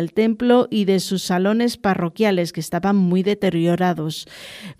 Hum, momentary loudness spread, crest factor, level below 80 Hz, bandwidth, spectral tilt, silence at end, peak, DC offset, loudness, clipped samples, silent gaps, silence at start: none; 9 LU; 16 dB; -56 dBFS; 15.5 kHz; -6 dB/octave; 0.05 s; -2 dBFS; under 0.1%; -19 LUFS; under 0.1%; none; 0 s